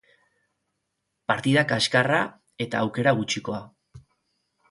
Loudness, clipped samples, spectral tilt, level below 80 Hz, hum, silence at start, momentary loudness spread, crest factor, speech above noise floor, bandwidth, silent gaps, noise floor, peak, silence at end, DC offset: -24 LUFS; under 0.1%; -4.5 dB/octave; -64 dBFS; none; 1.3 s; 13 LU; 22 dB; 55 dB; 11.5 kHz; none; -79 dBFS; -4 dBFS; 0.7 s; under 0.1%